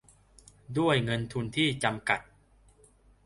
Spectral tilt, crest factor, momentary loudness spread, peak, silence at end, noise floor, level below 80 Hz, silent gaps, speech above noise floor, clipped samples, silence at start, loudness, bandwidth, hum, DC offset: -5 dB/octave; 22 dB; 6 LU; -10 dBFS; 1.05 s; -61 dBFS; -58 dBFS; none; 32 dB; under 0.1%; 0.7 s; -29 LUFS; 11.5 kHz; 50 Hz at -55 dBFS; under 0.1%